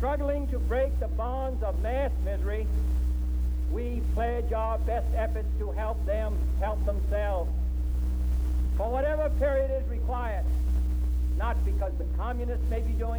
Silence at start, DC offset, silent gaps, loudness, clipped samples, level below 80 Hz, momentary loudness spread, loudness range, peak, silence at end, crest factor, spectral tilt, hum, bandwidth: 0 s; under 0.1%; none; -29 LUFS; under 0.1%; -28 dBFS; 3 LU; 1 LU; -14 dBFS; 0 s; 12 dB; -8 dB/octave; none; 3.9 kHz